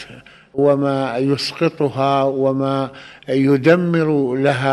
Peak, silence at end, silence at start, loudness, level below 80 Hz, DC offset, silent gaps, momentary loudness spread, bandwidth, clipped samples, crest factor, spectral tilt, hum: 0 dBFS; 0 s; 0 s; -17 LUFS; -58 dBFS; under 0.1%; none; 9 LU; 12 kHz; under 0.1%; 16 dB; -7 dB/octave; none